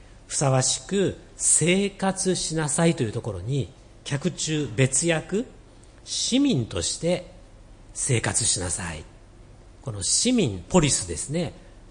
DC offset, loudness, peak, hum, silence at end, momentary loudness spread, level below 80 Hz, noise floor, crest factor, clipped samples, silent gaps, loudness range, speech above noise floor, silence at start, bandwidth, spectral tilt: under 0.1%; -24 LUFS; -6 dBFS; none; 0 s; 11 LU; -48 dBFS; -48 dBFS; 18 dB; under 0.1%; none; 4 LU; 24 dB; 0 s; 10.5 kHz; -4 dB/octave